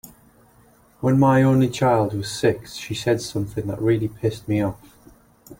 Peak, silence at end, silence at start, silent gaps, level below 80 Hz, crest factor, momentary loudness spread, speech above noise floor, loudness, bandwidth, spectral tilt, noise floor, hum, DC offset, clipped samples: -4 dBFS; 0.05 s; 0.05 s; none; -50 dBFS; 18 dB; 11 LU; 34 dB; -21 LUFS; 16.5 kHz; -6.5 dB/octave; -54 dBFS; none; under 0.1%; under 0.1%